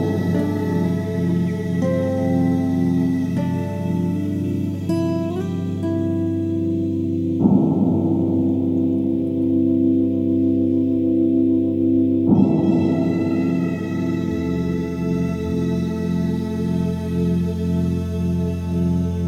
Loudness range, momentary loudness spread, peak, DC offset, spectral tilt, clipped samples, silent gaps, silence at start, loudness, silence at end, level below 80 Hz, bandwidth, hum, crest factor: 4 LU; 6 LU; -2 dBFS; under 0.1%; -9 dB/octave; under 0.1%; none; 0 s; -20 LUFS; 0 s; -44 dBFS; 13 kHz; none; 16 dB